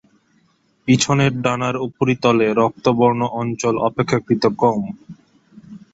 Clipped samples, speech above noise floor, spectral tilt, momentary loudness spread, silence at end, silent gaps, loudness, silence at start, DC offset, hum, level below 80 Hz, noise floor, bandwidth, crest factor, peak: under 0.1%; 43 dB; -5.5 dB/octave; 7 LU; 0.15 s; none; -18 LUFS; 0.85 s; under 0.1%; none; -54 dBFS; -60 dBFS; 8 kHz; 18 dB; -2 dBFS